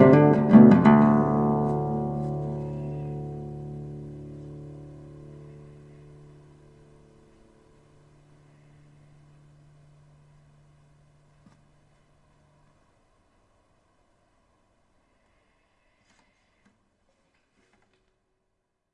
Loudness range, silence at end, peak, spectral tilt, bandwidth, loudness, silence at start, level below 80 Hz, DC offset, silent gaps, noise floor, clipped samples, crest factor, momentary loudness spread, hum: 29 LU; 14.05 s; -2 dBFS; -10 dB/octave; 5.2 kHz; -21 LUFS; 0 s; -56 dBFS; under 0.1%; none; -78 dBFS; under 0.1%; 24 dB; 31 LU; none